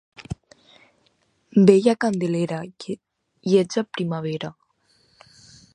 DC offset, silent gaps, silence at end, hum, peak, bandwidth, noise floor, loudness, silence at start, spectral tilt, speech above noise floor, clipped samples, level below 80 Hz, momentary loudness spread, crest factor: under 0.1%; none; 1.25 s; none; -2 dBFS; 10.5 kHz; -65 dBFS; -21 LUFS; 0.2 s; -6.5 dB/octave; 45 dB; under 0.1%; -56 dBFS; 21 LU; 22 dB